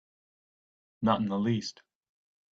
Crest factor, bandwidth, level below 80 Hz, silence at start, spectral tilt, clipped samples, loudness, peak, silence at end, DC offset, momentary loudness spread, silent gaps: 22 dB; 7.8 kHz; -66 dBFS; 1 s; -6.5 dB/octave; under 0.1%; -30 LUFS; -12 dBFS; 0.8 s; under 0.1%; 6 LU; none